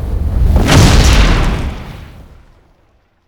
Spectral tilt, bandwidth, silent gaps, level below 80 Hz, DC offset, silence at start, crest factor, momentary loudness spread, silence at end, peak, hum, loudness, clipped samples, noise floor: -5 dB/octave; 19 kHz; none; -14 dBFS; under 0.1%; 0 s; 12 dB; 21 LU; 1.05 s; 0 dBFS; none; -11 LUFS; 0.6%; -53 dBFS